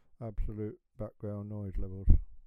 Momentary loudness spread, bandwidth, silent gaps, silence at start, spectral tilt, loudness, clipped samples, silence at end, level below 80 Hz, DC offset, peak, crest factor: 14 LU; 2.3 kHz; none; 0.2 s; -12 dB/octave; -38 LUFS; under 0.1%; 0.05 s; -34 dBFS; under 0.1%; -6 dBFS; 24 dB